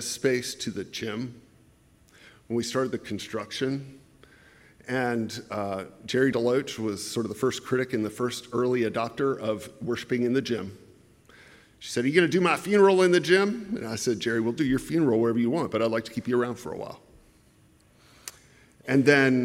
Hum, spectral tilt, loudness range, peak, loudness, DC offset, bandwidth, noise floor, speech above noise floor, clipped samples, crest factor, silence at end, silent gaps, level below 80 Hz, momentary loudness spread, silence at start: none; -5 dB/octave; 9 LU; -6 dBFS; -26 LUFS; under 0.1%; 16 kHz; -59 dBFS; 34 dB; under 0.1%; 22 dB; 0 s; none; -62 dBFS; 15 LU; 0 s